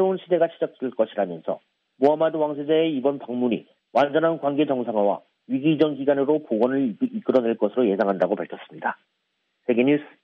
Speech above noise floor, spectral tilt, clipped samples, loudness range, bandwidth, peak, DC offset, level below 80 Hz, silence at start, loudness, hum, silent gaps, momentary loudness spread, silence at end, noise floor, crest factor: 52 dB; -5 dB/octave; under 0.1%; 2 LU; 6.2 kHz; -4 dBFS; under 0.1%; -74 dBFS; 0 s; -23 LUFS; none; none; 9 LU; 0.15 s; -75 dBFS; 18 dB